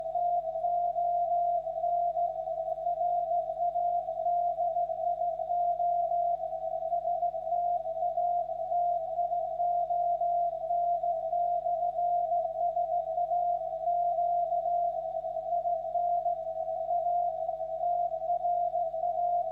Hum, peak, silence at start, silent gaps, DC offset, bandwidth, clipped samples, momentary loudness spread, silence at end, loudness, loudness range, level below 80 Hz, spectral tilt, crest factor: 50 Hz at -60 dBFS; -22 dBFS; 0 s; none; under 0.1%; 3.8 kHz; under 0.1%; 4 LU; 0 s; -30 LUFS; 1 LU; -64 dBFS; -7.5 dB/octave; 8 dB